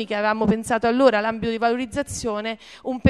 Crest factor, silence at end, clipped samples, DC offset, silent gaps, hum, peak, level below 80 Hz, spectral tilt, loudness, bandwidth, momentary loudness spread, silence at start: 22 dB; 0 s; under 0.1%; under 0.1%; none; none; 0 dBFS; -50 dBFS; -5.5 dB/octave; -22 LUFS; 13 kHz; 12 LU; 0 s